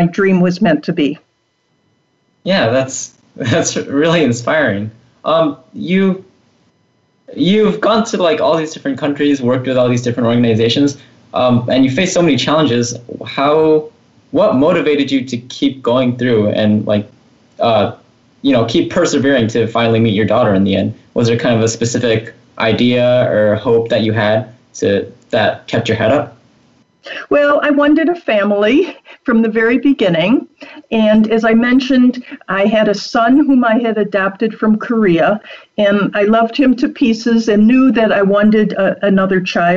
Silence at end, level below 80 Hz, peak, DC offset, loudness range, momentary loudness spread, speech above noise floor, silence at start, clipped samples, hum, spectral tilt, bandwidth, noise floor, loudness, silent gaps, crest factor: 0 s; -50 dBFS; -4 dBFS; under 0.1%; 4 LU; 8 LU; 49 dB; 0 s; under 0.1%; none; -5.5 dB/octave; 8 kHz; -62 dBFS; -13 LUFS; none; 10 dB